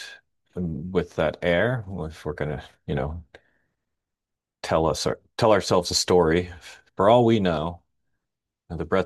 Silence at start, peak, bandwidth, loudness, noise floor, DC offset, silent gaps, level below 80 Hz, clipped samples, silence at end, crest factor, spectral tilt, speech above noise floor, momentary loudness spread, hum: 0 s; -4 dBFS; 12.5 kHz; -23 LUFS; -86 dBFS; under 0.1%; none; -48 dBFS; under 0.1%; 0 s; 20 dB; -5 dB/octave; 63 dB; 18 LU; none